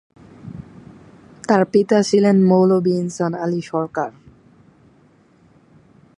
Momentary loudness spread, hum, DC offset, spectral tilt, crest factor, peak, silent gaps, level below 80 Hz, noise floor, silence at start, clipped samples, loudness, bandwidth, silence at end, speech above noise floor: 22 LU; none; under 0.1%; -7 dB/octave; 18 dB; -2 dBFS; none; -60 dBFS; -53 dBFS; 0.45 s; under 0.1%; -17 LUFS; 10.5 kHz; 2.1 s; 37 dB